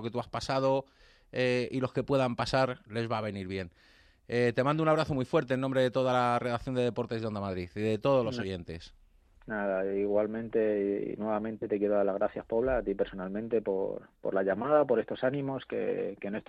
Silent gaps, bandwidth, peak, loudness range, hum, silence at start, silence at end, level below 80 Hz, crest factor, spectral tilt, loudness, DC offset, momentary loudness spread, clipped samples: none; 11 kHz; -12 dBFS; 3 LU; none; 0 s; 0.05 s; -58 dBFS; 18 dB; -7 dB/octave; -31 LUFS; under 0.1%; 9 LU; under 0.1%